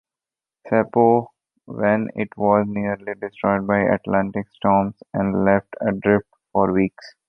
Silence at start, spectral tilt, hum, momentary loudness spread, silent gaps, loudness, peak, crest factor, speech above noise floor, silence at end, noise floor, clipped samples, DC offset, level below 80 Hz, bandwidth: 0.65 s; -10 dB/octave; none; 9 LU; none; -21 LUFS; -2 dBFS; 18 dB; 70 dB; 0.2 s; -90 dBFS; under 0.1%; under 0.1%; -52 dBFS; 5.8 kHz